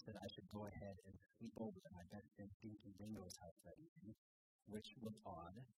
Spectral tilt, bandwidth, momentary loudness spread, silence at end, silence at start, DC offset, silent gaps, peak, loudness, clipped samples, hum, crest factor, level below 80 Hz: -6 dB/octave; 15.5 kHz; 10 LU; 0.05 s; 0 s; under 0.1%; 2.54-2.60 s, 3.51-3.56 s, 3.88-3.96 s, 4.18-4.59 s; -38 dBFS; -57 LUFS; under 0.1%; none; 18 dB; -78 dBFS